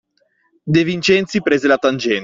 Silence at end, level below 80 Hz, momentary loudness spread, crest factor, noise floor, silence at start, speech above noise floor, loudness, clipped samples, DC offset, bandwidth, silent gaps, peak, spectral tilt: 0 s; -54 dBFS; 3 LU; 14 dB; -63 dBFS; 0.65 s; 47 dB; -16 LUFS; under 0.1%; under 0.1%; 7.8 kHz; none; -2 dBFS; -5.5 dB/octave